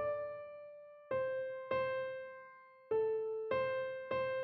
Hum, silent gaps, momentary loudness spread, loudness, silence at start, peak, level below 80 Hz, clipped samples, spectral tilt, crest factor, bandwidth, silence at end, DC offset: none; none; 18 LU; -39 LUFS; 0 s; -24 dBFS; -76 dBFS; under 0.1%; -3 dB/octave; 16 dB; 5.8 kHz; 0 s; under 0.1%